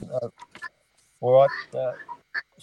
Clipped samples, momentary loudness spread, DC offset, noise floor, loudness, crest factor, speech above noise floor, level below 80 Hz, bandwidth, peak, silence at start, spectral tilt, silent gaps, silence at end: under 0.1%; 21 LU; under 0.1%; -65 dBFS; -24 LUFS; 20 dB; 42 dB; -70 dBFS; 9.2 kHz; -6 dBFS; 0 s; -6.5 dB/octave; none; 0.2 s